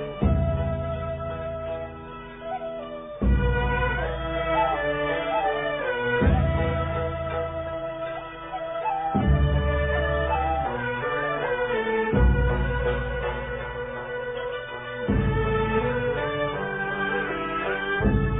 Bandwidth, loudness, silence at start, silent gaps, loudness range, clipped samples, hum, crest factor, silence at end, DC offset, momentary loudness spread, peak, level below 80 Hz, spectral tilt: 3.9 kHz; -26 LUFS; 0 s; none; 3 LU; under 0.1%; none; 16 dB; 0 s; under 0.1%; 10 LU; -8 dBFS; -30 dBFS; -11 dB/octave